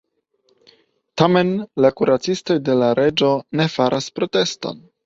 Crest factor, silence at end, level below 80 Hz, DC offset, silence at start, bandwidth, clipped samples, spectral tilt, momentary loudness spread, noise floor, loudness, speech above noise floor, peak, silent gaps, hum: 18 dB; 0.25 s; -56 dBFS; under 0.1%; 1.15 s; 7.8 kHz; under 0.1%; -5.5 dB/octave; 7 LU; -64 dBFS; -18 LUFS; 46 dB; -2 dBFS; none; none